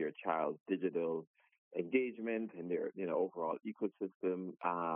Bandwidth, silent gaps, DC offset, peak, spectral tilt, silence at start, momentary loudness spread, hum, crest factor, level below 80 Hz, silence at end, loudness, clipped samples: 3.6 kHz; 0.61-0.66 s, 1.27-1.34 s, 1.58-1.71 s, 4.15-4.20 s; under 0.1%; -20 dBFS; -2.5 dB/octave; 0 s; 5 LU; none; 18 dB; under -90 dBFS; 0 s; -39 LUFS; under 0.1%